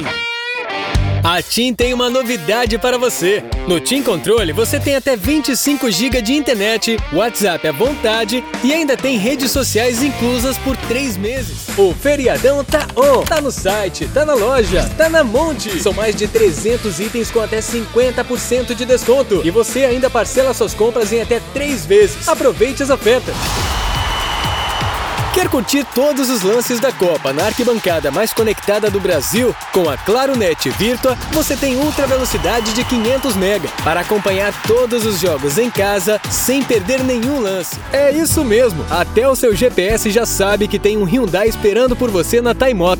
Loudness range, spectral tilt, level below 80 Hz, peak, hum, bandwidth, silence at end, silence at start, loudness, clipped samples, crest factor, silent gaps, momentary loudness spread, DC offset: 2 LU; -4 dB/octave; -30 dBFS; 0 dBFS; none; over 20 kHz; 0 s; 0 s; -15 LUFS; under 0.1%; 14 dB; none; 5 LU; under 0.1%